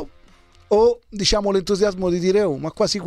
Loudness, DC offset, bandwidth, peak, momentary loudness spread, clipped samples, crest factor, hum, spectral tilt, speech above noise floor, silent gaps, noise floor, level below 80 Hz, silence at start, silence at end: -19 LUFS; under 0.1%; 12.5 kHz; -6 dBFS; 5 LU; under 0.1%; 14 dB; none; -4.5 dB/octave; 31 dB; none; -50 dBFS; -40 dBFS; 0 s; 0 s